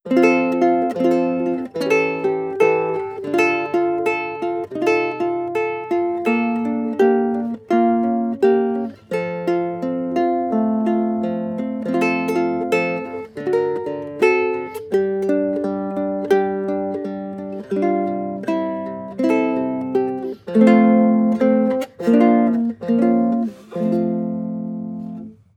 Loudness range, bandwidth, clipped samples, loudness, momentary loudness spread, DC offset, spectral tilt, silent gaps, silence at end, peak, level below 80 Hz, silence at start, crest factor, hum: 5 LU; 13 kHz; under 0.1%; -19 LUFS; 10 LU; under 0.1%; -7.5 dB/octave; none; 0.25 s; -2 dBFS; -66 dBFS; 0.05 s; 16 dB; none